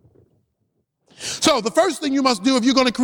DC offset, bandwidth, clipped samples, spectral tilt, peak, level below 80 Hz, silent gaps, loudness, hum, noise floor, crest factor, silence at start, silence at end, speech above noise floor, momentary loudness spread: under 0.1%; 20 kHz; under 0.1%; -3 dB/octave; -2 dBFS; -58 dBFS; none; -18 LUFS; none; -71 dBFS; 18 dB; 1.2 s; 0 s; 53 dB; 6 LU